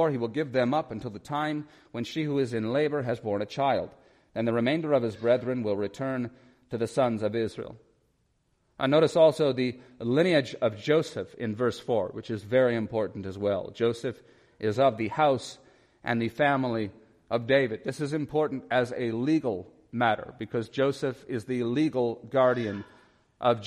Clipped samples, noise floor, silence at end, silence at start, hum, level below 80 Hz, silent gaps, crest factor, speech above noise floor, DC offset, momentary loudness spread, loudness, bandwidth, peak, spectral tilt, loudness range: under 0.1%; -71 dBFS; 0 s; 0 s; none; -66 dBFS; none; 18 dB; 44 dB; under 0.1%; 11 LU; -28 LUFS; 12.5 kHz; -8 dBFS; -6.5 dB/octave; 4 LU